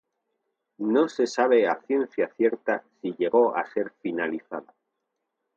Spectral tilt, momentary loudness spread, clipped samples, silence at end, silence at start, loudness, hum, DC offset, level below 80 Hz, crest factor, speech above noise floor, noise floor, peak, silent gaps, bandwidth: -5 dB/octave; 11 LU; under 0.1%; 0.95 s; 0.8 s; -25 LUFS; none; under 0.1%; -78 dBFS; 18 dB; 56 dB; -81 dBFS; -8 dBFS; none; 7.6 kHz